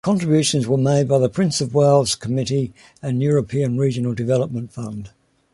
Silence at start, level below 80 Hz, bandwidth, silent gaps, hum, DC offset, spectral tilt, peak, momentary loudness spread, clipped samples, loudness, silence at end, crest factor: 0.05 s; -52 dBFS; 11.5 kHz; none; none; under 0.1%; -6 dB/octave; -2 dBFS; 14 LU; under 0.1%; -19 LUFS; 0.45 s; 16 dB